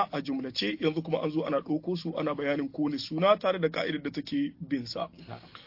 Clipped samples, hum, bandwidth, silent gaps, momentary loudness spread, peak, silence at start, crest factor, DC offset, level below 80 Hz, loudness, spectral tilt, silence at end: under 0.1%; none; 5.8 kHz; none; 9 LU; -10 dBFS; 0 s; 20 dB; under 0.1%; -68 dBFS; -30 LUFS; -6.5 dB/octave; 0 s